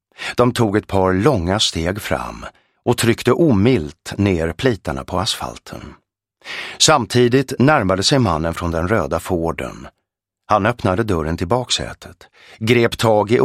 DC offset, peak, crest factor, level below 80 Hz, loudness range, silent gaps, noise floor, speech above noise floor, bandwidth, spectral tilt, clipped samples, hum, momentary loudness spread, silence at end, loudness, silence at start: under 0.1%; 0 dBFS; 18 dB; -40 dBFS; 4 LU; none; -76 dBFS; 59 dB; 15.5 kHz; -5 dB/octave; under 0.1%; none; 14 LU; 0 s; -17 LUFS; 0.2 s